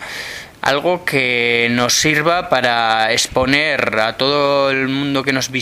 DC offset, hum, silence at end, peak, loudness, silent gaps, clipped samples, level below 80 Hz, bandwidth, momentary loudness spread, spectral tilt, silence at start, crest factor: under 0.1%; none; 0 s; 0 dBFS; -15 LUFS; none; under 0.1%; -46 dBFS; 16 kHz; 4 LU; -3 dB/octave; 0 s; 16 dB